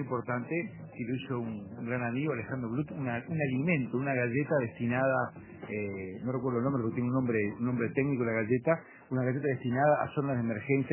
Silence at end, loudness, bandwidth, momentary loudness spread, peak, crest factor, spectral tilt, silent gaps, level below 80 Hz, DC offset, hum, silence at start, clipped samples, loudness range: 0 s; -32 LUFS; 3.2 kHz; 8 LU; -12 dBFS; 20 dB; -7.5 dB/octave; none; -64 dBFS; under 0.1%; none; 0 s; under 0.1%; 3 LU